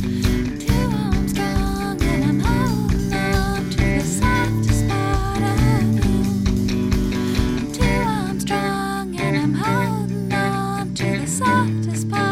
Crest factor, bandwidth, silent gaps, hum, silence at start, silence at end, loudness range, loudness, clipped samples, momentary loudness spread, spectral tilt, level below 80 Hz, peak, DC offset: 16 dB; 16.5 kHz; none; none; 0 s; 0 s; 2 LU; -20 LUFS; under 0.1%; 4 LU; -6 dB/octave; -28 dBFS; -4 dBFS; under 0.1%